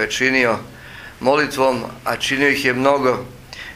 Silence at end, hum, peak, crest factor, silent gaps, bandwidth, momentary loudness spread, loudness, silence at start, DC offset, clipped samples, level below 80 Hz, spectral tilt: 0 s; none; 0 dBFS; 18 dB; none; 16 kHz; 19 LU; -18 LUFS; 0 s; under 0.1%; under 0.1%; -48 dBFS; -4 dB/octave